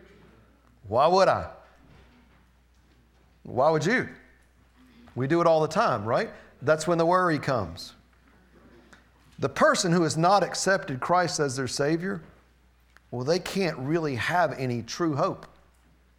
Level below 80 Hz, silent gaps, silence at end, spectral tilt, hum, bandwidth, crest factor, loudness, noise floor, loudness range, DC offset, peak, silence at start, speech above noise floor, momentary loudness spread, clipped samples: -58 dBFS; none; 0.7 s; -5 dB/octave; none; 16.5 kHz; 20 dB; -25 LUFS; -60 dBFS; 4 LU; under 0.1%; -8 dBFS; 0.85 s; 36 dB; 12 LU; under 0.1%